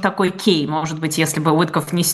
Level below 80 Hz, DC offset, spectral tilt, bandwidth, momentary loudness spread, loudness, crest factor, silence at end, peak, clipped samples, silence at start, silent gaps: -60 dBFS; under 0.1%; -4.5 dB/octave; 13 kHz; 5 LU; -18 LUFS; 18 dB; 0 s; 0 dBFS; under 0.1%; 0 s; none